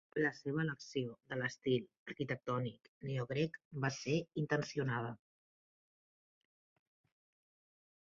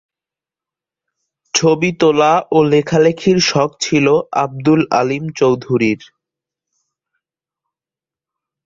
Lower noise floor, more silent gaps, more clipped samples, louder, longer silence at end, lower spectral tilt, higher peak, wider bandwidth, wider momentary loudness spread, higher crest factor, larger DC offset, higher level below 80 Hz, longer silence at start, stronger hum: about the same, under -90 dBFS vs -90 dBFS; first, 1.97-2.06 s, 2.88-3.01 s, 3.65-3.71 s vs none; neither; second, -39 LUFS vs -14 LUFS; first, 2.95 s vs 2.6 s; about the same, -5.5 dB/octave vs -5 dB/octave; second, -20 dBFS vs -2 dBFS; about the same, 7.4 kHz vs 7.8 kHz; first, 8 LU vs 5 LU; about the same, 20 dB vs 16 dB; neither; second, -74 dBFS vs -54 dBFS; second, 0.15 s vs 1.55 s; neither